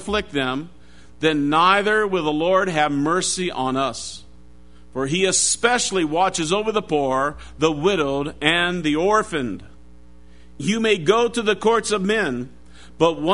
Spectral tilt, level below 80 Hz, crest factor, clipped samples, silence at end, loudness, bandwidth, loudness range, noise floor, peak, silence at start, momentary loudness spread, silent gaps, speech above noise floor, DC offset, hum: -3.5 dB/octave; -48 dBFS; 20 dB; under 0.1%; 0 s; -20 LUFS; 11 kHz; 2 LU; -48 dBFS; -2 dBFS; 0 s; 11 LU; none; 28 dB; 0.7%; none